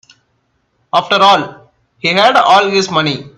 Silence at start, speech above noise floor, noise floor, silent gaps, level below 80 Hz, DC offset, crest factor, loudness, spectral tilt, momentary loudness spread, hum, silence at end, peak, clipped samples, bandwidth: 0.95 s; 51 dB; -62 dBFS; none; -56 dBFS; under 0.1%; 14 dB; -11 LUFS; -3.5 dB/octave; 8 LU; none; 0.1 s; 0 dBFS; under 0.1%; 12.5 kHz